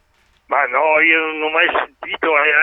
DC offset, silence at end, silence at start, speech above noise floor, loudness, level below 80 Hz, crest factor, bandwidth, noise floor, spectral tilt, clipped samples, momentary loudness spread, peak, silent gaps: under 0.1%; 0 s; 0.5 s; 40 dB; -15 LUFS; -60 dBFS; 16 dB; 4 kHz; -56 dBFS; -5 dB/octave; under 0.1%; 9 LU; 0 dBFS; none